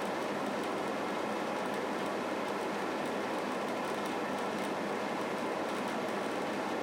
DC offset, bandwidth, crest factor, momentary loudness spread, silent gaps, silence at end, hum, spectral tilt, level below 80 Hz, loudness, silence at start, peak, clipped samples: under 0.1%; 17.5 kHz; 12 dB; 0 LU; none; 0 s; none; -4.5 dB/octave; -78 dBFS; -35 LUFS; 0 s; -22 dBFS; under 0.1%